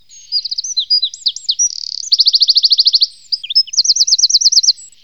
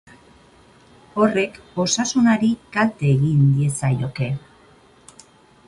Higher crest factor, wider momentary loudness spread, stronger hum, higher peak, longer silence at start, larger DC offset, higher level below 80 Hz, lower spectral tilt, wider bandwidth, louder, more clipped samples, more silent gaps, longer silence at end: about the same, 14 dB vs 16 dB; about the same, 9 LU vs 9 LU; first, 50 Hz at -70 dBFS vs none; first, 0 dBFS vs -4 dBFS; second, 0.3 s vs 1.15 s; first, 0.4% vs under 0.1%; second, -68 dBFS vs -52 dBFS; second, 7 dB/octave vs -5.5 dB/octave; first, 18 kHz vs 11.5 kHz; first, -10 LUFS vs -20 LUFS; neither; neither; second, 0.2 s vs 1.3 s